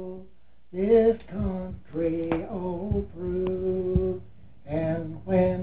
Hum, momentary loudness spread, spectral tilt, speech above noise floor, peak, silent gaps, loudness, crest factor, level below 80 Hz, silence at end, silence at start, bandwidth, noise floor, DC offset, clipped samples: none; 14 LU; -12.5 dB/octave; 26 dB; -10 dBFS; none; -27 LUFS; 18 dB; -42 dBFS; 0 s; 0 s; 4 kHz; -50 dBFS; 0.6%; under 0.1%